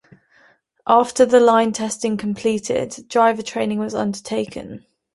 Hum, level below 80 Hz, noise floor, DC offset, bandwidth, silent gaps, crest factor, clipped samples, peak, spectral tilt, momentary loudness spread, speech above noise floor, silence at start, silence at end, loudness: none; -58 dBFS; -56 dBFS; under 0.1%; 11.5 kHz; none; 18 dB; under 0.1%; -2 dBFS; -4.5 dB/octave; 12 LU; 38 dB; 0.85 s; 0.35 s; -19 LUFS